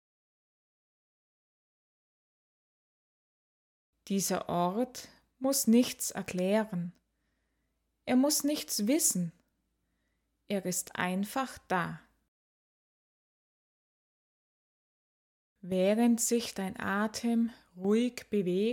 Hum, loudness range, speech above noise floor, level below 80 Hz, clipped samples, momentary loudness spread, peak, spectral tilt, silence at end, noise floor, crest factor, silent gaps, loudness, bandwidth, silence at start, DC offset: none; 8 LU; 49 dB; -72 dBFS; under 0.1%; 11 LU; -14 dBFS; -4 dB/octave; 0 s; -79 dBFS; 20 dB; 12.28-15.56 s; -31 LUFS; 18 kHz; 4.05 s; under 0.1%